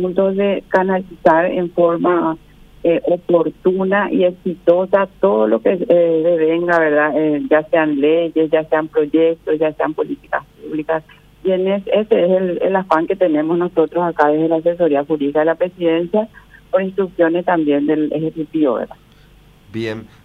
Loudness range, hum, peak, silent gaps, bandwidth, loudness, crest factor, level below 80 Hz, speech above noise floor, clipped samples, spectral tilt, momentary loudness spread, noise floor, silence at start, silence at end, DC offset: 4 LU; none; 0 dBFS; none; 5.4 kHz; -16 LUFS; 16 dB; -52 dBFS; 31 dB; under 0.1%; -8.5 dB/octave; 8 LU; -46 dBFS; 0 s; 0.2 s; under 0.1%